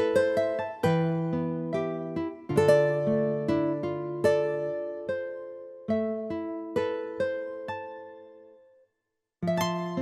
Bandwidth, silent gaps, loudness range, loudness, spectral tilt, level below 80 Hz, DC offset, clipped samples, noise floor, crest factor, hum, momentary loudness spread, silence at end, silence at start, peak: 15.5 kHz; none; 7 LU; -28 LUFS; -7 dB/octave; -64 dBFS; under 0.1%; under 0.1%; -83 dBFS; 20 dB; none; 13 LU; 0 s; 0 s; -8 dBFS